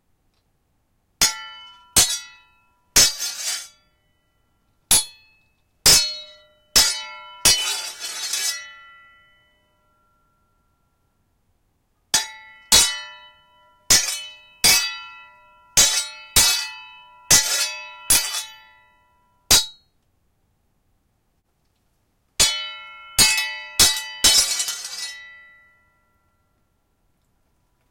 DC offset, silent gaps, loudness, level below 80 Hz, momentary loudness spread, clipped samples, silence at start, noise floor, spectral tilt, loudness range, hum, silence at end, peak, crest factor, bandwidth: under 0.1%; none; -17 LUFS; -46 dBFS; 19 LU; under 0.1%; 1.2 s; -68 dBFS; 1 dB/octave; 9 LU; none; 2.6 s; 0 dBFS; 24 dB; 16.5 kHz